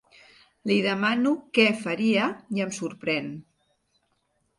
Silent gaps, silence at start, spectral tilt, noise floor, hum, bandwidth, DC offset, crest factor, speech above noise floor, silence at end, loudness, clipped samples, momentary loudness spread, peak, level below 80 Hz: none; 0.65 s; -5 dB/octave; -72 dBFS; none; 11.5 kHz; under 0.1%; 20 dB; 47 dB; 1.15 s; -25 LUFS; under 0.1%; 10 LU; -6 dBFS; -72 dBFS